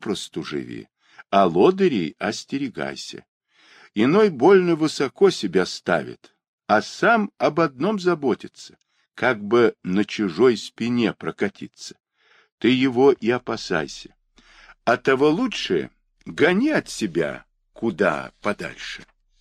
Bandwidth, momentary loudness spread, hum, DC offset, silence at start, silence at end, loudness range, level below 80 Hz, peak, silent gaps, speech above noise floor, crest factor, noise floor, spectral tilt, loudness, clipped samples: 10.5 kHz; 17 LU; none; under 0.1%; 0 s; 0.4 s; 3 LU; -60 dBFS; -4 dBFS; 3.28-3.41 s, 6.48-6.58 s, 12.52-12.58 s; 32 dB; 18 dB; -53 dBFS; -5.5 dB/octave; -21 LUFS; under 0.1%